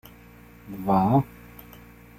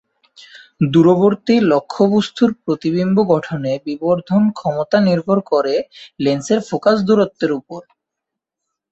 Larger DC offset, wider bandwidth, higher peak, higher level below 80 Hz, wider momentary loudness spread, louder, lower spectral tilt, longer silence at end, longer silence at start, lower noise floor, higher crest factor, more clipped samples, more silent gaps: neither; first, 16 kHz vs 8 kHz; second, -8 dBFS vs -2 dBFS; first, -52 dBFS vs -58 dBFS; first, 25 LU vs 8 LU; second, -23 LUFS vs -16 LUFS; first, -9.5 dB/octave vs -7 dB/octave; second, 0.55 s vs 1.1 s; about the same, 0.65 s vs 0.55 s; second, -49 dBFS vs -82 dBFS; about the same, 20 dB vs 16 dB; neither; neither